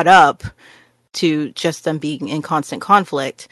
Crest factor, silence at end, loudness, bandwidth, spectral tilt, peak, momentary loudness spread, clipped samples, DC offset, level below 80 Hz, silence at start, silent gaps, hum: 16 dB; 0.05 s; -17 LUFS; 12.5 kHz; -4.5 dB/octave; 0 dBFS; 13 LU; under 0.1%; under 0.1%; -50 dBFS; 0 s; none; none